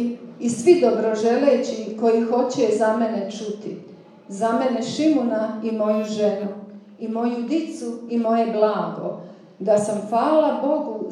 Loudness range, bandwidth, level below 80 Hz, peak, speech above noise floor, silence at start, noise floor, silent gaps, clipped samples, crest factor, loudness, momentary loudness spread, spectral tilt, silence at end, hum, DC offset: 4 LU; 11 kHz; -84 dBFS; -4 dBFS; 23 dB; 0 s; -43 dBFS; none; under 0.1%; 18 dB; -21 LUFS; 13 LU; -5.5 dB/octave; 0 s; none; under 0.1%